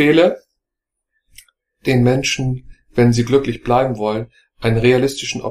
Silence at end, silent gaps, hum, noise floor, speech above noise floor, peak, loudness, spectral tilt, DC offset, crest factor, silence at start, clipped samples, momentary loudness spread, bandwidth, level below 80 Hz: 0 s; none; none; -81 dBFS; 65 dB; 0 dBFS; -17 LUFS; -6 dB/octave; under 0.1%; 16 dB; 0 s; under 0.1%; 11 LU; 14 kHz; -42 dBFS